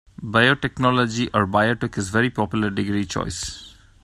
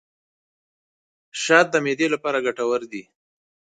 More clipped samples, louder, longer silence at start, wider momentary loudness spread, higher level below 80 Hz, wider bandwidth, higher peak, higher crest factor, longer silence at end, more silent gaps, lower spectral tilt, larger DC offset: neither; about the same, -21 LUFS vs -21 LUFS; second, 0.2 s vs 1.35 s; second, 9 LU vs 19 LU; first, -46 dBFS vs -72 dBFS; first, 13 kHz vs 9.4 kHz; about the same, -2 dBFS vs 0 dBFS; about the same, 20 dB vs 24 dB; second, 0.35 s vs 0.8 s; neither; first, -5 dB/octave vs -3.5 dB/octave; neither